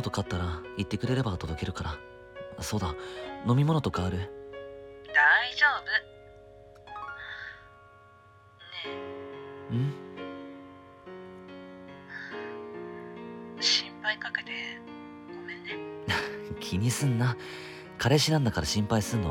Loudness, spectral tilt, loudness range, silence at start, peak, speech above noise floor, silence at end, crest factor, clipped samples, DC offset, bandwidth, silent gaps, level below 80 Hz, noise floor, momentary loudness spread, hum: -29 LUFS; -4.5 dB/octave; 13 LU; 0 s; -10 dBFS; 28 dB; 0 s; 22 dB; under 0.1%; under 0.1%; 17 kHz; none; -52 dBFS; -56 dBFS; 21 LU; none